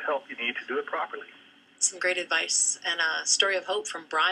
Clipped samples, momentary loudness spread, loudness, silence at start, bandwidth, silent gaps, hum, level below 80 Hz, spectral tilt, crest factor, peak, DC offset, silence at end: under 0.1%; 10 LU; -26 LUFS; 0 s; 12.5 kHz; none; none; under -90 dBFS; 1.5 dB/octave; 22 dB; -8 dBFS; under 0.1%; 0 s